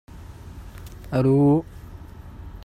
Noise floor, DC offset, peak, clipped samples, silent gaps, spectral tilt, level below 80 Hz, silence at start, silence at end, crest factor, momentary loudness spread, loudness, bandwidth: -40 dBFS; under 0.1%; -8 dBFS; under 0.1%; none; -9.5 dB/octave; -42 dBFS; 0.15 s; 0.05 s; 16 dB; 24 LU; -20 LUFS; 14 kHz